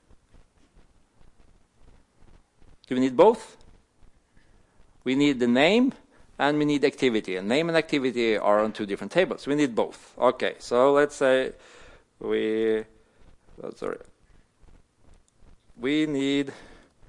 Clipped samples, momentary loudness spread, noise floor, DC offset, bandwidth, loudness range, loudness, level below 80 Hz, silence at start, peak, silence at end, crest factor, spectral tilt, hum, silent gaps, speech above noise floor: under 0.1%; 14 LU; -58 dBFS; under 0.1%; 11.5 kHz; 8 LU; -24 LUFS; -58 dBFS; 2.9 s; -6 dBFS; 0.4 s; 20 dB; -5.5 dB/octave; none; none; 35 dB